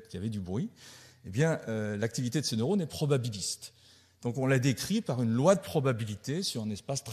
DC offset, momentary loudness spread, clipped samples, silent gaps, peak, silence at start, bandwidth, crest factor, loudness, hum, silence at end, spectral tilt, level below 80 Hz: under 0.1%; 12 LU; under 0.1%; none; -10 dBFS; 0 s; 13.5 kHz; 20 dB; -31 LUFS; none; 0 s; -5.5 dB/octave; -66 dBFS